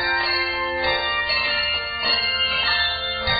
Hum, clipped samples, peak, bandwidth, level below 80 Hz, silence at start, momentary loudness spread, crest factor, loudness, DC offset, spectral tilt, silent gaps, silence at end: none; under 0.1%; -8 dBFS; 5.4 kHz; -42 dBFS; 0 s; 4 LU; 14 dB; -20 LUFS; under 0.1%; -7 dB/octave; none; 0 s